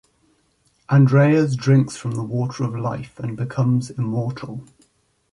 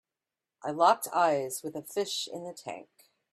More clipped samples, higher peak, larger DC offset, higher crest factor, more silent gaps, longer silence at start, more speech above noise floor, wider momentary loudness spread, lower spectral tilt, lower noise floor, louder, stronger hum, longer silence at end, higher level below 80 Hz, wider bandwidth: neither; first, -4 dBFS vs -10 dBFS; neither; second, 16 dB vs 22 dB; neither; first, 0.9 s vs 0.65 s; second, 44 dB vs 60 dB; second, 14 LU vs 17 LU; first, -8 dB/octave vs -3 dB/octave; second, -63 dBFS vs -90 dBFS; first, -20 LUFS vs -29 LUFS; neither; first, 0.7 s vs 0.5 s; first, -58 dBFS vs -82 dBFS; second, 11 kHz vs 15.5 kHz